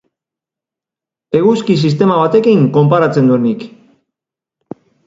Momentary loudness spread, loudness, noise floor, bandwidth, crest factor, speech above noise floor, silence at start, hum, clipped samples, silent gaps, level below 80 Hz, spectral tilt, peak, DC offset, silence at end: 6 LU; -11 LUFS; -87 dBFS; 7.8 kHz; 14 dB; 76 dB; 1.3 s; none; under 0.1%; none; -56 dBFS; -8 dB/octave; 0 dBFS; under 0.1%; 1.4 s